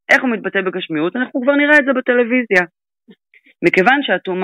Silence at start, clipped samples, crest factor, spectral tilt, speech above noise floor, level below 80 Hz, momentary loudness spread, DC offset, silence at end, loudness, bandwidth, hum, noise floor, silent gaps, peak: 0.1 s; under 0.1%; 16 dB; -5.5 dB/octave; 36 dB; -62 dBFS; 9 LU; under 0.1%; 0 s; -15 LUFS; 13 kHz; none; -51 dBFS; none; 0 dBFS